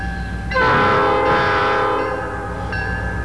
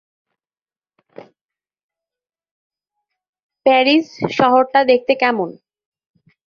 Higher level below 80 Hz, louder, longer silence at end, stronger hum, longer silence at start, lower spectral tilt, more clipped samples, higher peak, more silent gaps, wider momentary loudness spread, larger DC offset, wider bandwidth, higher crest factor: first, -32 dBFS vs -64 dBFS; second, -18 LUFS vs -15 LUFS; second, 0 s vs 1 s; neither; second, 0 s vs 1.2 s; about the same, -6 dB/octave vs -5.5 dB/octave; neither; second, -8 dBFS vs -2 dBFS; second, none vs 1.41-1.49 s, 1.83-1.89 s, 2.51-2.70 s, 3.29-3.33 s, 3.43-3.49 s; about the same, 11 LU vs 9 LU; first, 0.8% vs under 0.1%; first, 11 kHz vs 7 kHz; second, 10 dB vs 18 dB